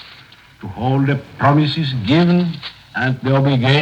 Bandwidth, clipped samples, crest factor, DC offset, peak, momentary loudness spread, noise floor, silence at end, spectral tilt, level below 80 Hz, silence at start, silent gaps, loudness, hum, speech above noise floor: 8 kHz; under 0.1%; 14 dB; under 0.1%; -2 dBFS; 13 LU; -43 dBFS; 0 s; -8 dB/octave; -50 dBFS; 0.05 s; none; -17 LUFS; none; 28 dB